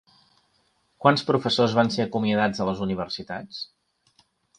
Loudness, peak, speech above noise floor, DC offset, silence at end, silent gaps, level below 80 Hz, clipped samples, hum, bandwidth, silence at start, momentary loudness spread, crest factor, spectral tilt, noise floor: -24 LUFS; -4 dBFS; 44 dB; under 0.1%; 0.95 s; none; -58 dBFS; under 0.1%; none; 10.5 kHz; 1 s; 14 LU; 22 dB; -6 dB/octave; -68 dBFS